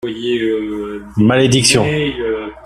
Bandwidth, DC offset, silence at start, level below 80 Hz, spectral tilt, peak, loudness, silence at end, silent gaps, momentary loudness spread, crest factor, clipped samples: 14.5 kHz; under 0.1%; 0.05 s; -42 dBFS; -4.5 dB/octave; 0 dBFS; -15 LUFS; 0.05 s; none; 12 LU; 16 dB; under 0.1%